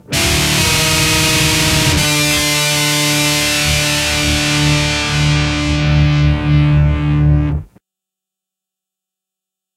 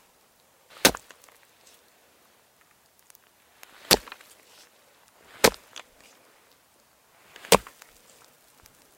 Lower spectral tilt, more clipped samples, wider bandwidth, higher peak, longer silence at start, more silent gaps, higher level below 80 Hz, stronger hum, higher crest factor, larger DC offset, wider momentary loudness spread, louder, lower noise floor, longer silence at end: first, -3.5 dB/octave vs -1.5 dB/octave; neither; about the same, 16 kHz vs 16.5 kHz; about the same, 0 dBFS vs 0 dBFS; second, 0.1 s vs 0.85 s; neither; first, -24 dBFS vs -56 dBFS; neither; second, 14 dB vs 30 dB; neither; second, 3 LU vs 25 LU; first, -12 LUFS vs -22 LUFS; first, -84 dBFS vs -62 dBFS; first, 2.1 s vs 1.4 s